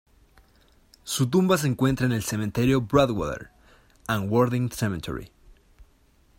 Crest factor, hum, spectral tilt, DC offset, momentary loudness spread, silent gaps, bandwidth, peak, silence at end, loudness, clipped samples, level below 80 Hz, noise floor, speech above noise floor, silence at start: 20 dB; none; -6 dB/octave; under 0.1%; 14 LU; none; 16.5 kHz; -6 dBFS; 0.55 s; -24 LUFS; under 0.1%; -48 dBFS; -60 dBFS; 37 dB; 1.05 s